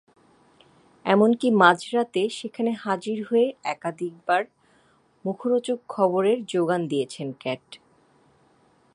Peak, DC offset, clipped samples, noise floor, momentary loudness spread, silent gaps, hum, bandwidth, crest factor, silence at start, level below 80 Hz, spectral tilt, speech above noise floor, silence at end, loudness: -2 dBFS; under 0.1%; under 0.1%; -61 dBFS; 14 LU; none; none; 11.5 kHz; 24 dB; 1.05 s; -76 dBFS; -5.5 dB/octave; 38 dB; 1.2 s; -24 LUFS